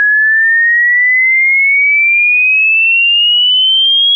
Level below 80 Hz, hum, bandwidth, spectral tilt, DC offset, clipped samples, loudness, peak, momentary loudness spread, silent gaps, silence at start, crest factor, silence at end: under -90 dBFS; none; 3.5 kHz; 21 dB/octave; under 0.1%; under 0.1%; -6 LUFS; -6 dBFS; 1 LU; none; 0 s; 4 dB; 0 s